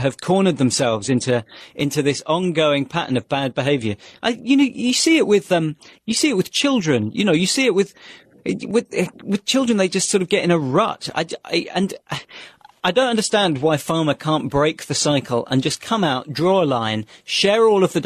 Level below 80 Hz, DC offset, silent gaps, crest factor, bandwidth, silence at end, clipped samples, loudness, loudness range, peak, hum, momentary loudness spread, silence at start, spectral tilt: -56 dBFS; under 0.1%; none; 14 dB; 13.5 kHz; 0 s; under 0.1%; -19 LUFS; 3 LU; -4 dBFS; none; 8 LU; 0 s; -4.5 dB/octave